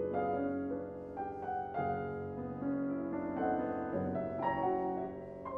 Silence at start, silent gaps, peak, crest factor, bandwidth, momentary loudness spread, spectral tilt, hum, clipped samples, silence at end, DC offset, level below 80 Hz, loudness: 0 s; none; -22 dBFS; 14 dB; 4.6 kHz; 7 LU; -10 dB/octave; none; under 0.1%; 0 s; under 0.1%; -64 dBFS; -37 LUFS